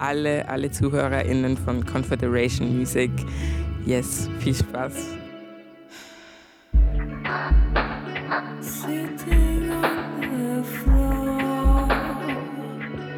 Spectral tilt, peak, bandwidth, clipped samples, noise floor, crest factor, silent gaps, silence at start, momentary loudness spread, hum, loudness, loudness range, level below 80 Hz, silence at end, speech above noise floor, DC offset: -6 dB/octave; -8 dBFS; 18 kHz; under 0.1%; -49 dBFS; 14 dB; none; 0 s; 11 LU; none; -24 LUFS; 4 LU; -26 dBFS; 0 s; 26 dB; under 0.1%